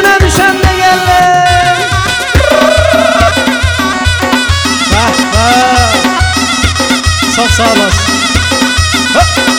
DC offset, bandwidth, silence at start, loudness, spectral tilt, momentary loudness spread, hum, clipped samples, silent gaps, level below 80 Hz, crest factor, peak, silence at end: under 0.1%; over 20 kHz; 0 s; -8 LUFS; -3.5 dB/octave; 3 LU; none; 0.9%; none; -20 dBFS; 8 dB; 0 dBFS; 0 s